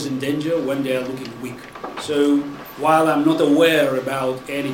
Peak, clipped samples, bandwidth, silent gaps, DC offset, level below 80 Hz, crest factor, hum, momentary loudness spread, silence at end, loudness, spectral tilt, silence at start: -4 dBFS; under 0.1%; 17 kHz; none; under 0.1%; -56 dBFS; 16 dB; none; 16 LU; 0 s; -19 LUFS; -5.5 dB/octave; 0 s